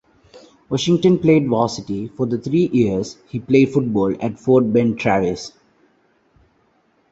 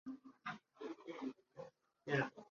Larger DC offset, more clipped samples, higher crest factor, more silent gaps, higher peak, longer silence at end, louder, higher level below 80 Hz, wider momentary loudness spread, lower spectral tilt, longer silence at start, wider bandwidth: neither; neither; second, 16 dB vs 22 dB; neither; first, -2 dBFS vs -24 dBFS; first, 1.65 s vs 0.05 s; first, -18 LUFS vs -46 LUFS; first, -52 dBFS vs -82 dBFS; second, 11 LU vs 17 LU; first, -7 dB/octave vs -4.5 dB/octave; first, 0.35 s vs 0.05 s; first, 8 kHz vs 7.2 kHz